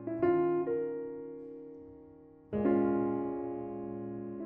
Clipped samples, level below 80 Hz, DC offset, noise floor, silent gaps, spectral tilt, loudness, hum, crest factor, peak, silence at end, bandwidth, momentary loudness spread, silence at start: under 0.1%; -64 dBFS; under 0.1%; -55 dBFS; none; -9 dB/octave; -33 LUFS; none; 18 dB; -16 dBFS; 0 s; 3.1 kHz; 19 LU; 0 s